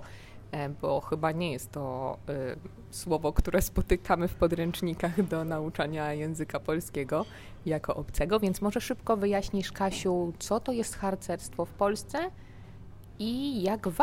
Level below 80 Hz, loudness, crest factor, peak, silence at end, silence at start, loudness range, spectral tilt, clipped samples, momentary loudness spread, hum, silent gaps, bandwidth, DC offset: -42 dBFS; -31 LUFS; 20 dB; -10 dBFS; 0 s; 0 s; 3 LU; -5.5 dB/octave; under 0.1%; 11 LU; none; none; 16 kHz; under 0.1%